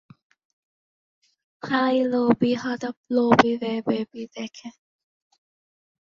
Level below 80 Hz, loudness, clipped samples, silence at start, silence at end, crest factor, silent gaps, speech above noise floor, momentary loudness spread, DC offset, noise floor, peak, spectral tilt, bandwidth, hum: -64 dBFS; -23 LUFS; under 0.1%; 1.65 s; 1.45 s; 24 dB; 2.97-3.04 s; over 67 dB; 17 LU; under 0.1%; under -90 dBFS; -2 dBFS; -6 dB/octave; 7.2 kHz; none